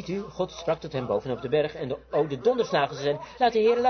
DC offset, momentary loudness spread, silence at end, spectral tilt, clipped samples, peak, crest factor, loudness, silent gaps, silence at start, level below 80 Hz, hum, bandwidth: under 0.1%; 7 LU; 0 s; -6 dB/octave; under 0.1%; -10 dBFS; 16 dB; -27 LUFS; none; 0 s; -56 dBFS; none; 6.6 kHz